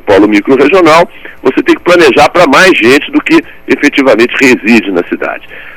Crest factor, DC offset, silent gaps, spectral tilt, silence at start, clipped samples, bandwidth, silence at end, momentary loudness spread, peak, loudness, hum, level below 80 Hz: 6 dB; under 0.1%; none; -4.5 dB/octave; 0.05 s; 6%; 17 kHz; 0 s; 10 LU; 0 dBFS; -6 LUFS; none; -38 dBFS